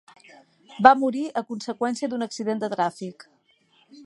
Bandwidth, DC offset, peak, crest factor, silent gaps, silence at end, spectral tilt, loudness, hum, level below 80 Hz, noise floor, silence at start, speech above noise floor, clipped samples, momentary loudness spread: 11.5 kHz; under 0.1%; 0 dBFS; 24 dB; none; 0 s; -5 dB/octave; -23 LUFS; none; -68 dBFS; -63 dBFS; 0.7 s; 39 dB; under 0.1%; 15 LU